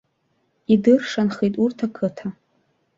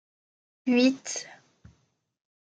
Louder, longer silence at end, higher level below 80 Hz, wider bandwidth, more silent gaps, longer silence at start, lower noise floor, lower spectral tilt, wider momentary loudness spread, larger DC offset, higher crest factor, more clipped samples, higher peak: first, -20 LUFS vs -26 LUFS; second, 0.65 s vs 1.1 s; first, -62 dBFS vs -74 dBFS; second, 7.6 kHz vs 9.2 kHz; neither; about the same, 0.7 s vs 0.65 s; about the same, -68 dBFS vs -71 dBFS; first, -7 dB/octave vs -3 dB/octave; first, 18 LU vs 14 LU; neither; about the same, 18 dB vs 20 dB; neither; first, -4 dBFS vs -10 dBFS